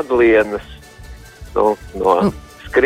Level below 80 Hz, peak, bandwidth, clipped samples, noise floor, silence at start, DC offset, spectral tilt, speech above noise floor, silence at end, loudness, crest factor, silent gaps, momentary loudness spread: -38 dBFS; -2 dBFS; 15 kHz; under 0.1%; -37 dBFS; 0 s; under 0.1%; -6.5 dB/octave; 22 dB; 0 s; -16 LUFS; 16 dB; none; 13 LU